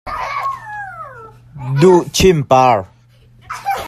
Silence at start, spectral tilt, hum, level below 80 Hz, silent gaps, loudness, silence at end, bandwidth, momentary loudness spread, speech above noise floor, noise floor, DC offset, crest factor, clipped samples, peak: 0.05 s; -5.5 dB/octave; none; -38 dBFS; none; -14 LUFS; 0 s; 14 kHz; 20 LU; 36 dB; -47 dBFS; under 0.1%; 16 dB; under 0.1%; 0 dBFS